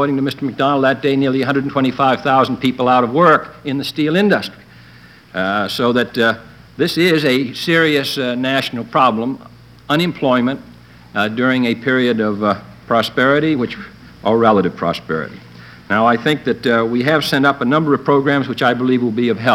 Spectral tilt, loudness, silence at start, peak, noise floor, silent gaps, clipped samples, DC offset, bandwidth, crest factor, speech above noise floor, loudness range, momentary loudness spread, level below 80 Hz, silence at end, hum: -6 dB/octave; -16 LUFS; 0 s; 0 dBFS; -42 dBFS; none; under 0.1%; under 0.1%; 16 kHz; 16 dB; 27 dB; 3 LU; 9 LU; -52 dBFS; 0 s; none